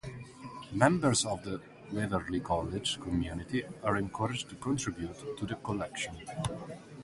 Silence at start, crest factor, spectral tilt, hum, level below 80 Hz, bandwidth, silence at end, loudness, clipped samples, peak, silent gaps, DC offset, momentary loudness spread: 0.05 s; 26 dB; -4.5 dB/octave; none; -52 dBFS; 11.5 kHz; 0 s; -33 LUFS; under 0.1%; -8 dBFS; none; under 0.1%; 14 LU